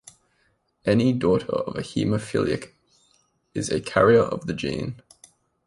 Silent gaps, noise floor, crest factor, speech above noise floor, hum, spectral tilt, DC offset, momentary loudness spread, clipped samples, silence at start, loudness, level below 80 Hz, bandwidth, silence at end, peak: none; -68 dBFS; 20 dB; 46 dB; none; -6 dB/octave; under 0.1%; 14 LU; under 0.1%; 0.85 s; -23 LUFS; -52 dBFS; 11.5 kHz; 0.75 s; -4 dBFS